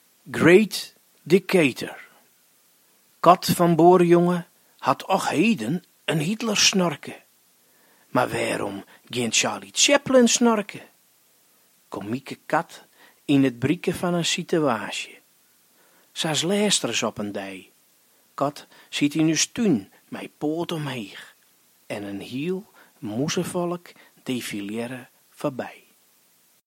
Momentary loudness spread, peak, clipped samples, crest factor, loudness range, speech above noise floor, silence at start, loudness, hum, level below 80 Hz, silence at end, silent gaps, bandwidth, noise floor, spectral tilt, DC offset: 20 LU; 0 dBFS; under 0.1%; 24 dB; 10 LU; 39 dB; 0.25 s; -22 LUFS; none; -66 dBFS; 0.95 s; none; 16.5 kHz; -61 dBFS; -4 dB/octave; under 0.1%